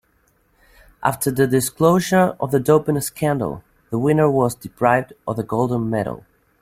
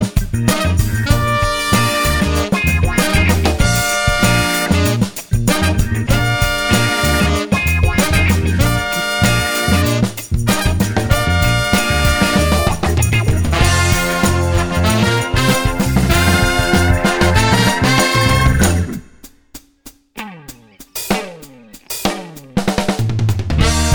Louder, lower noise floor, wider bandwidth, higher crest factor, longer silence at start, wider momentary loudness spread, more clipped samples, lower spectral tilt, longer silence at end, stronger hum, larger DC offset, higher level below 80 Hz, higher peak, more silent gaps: second, -19 LUFS vs -15 LUFS; first, -61 dBFS vs -43 dBFS; second, 16.5 kHz vs over 20 kHz; about the same, 18 dB vs 14 dB; first, 1 s vs 0 s; first, 11 LU vs 7 LU; neither; first, -6 dB/octave vs -4.5 dB/octave; first, 0.4 s vs 0 s; neither; second, under 0.1% vs 1%; second, -52 dBFS vs -22 dBFS; about the same, -2 dBFS vs 0 dBFS; neither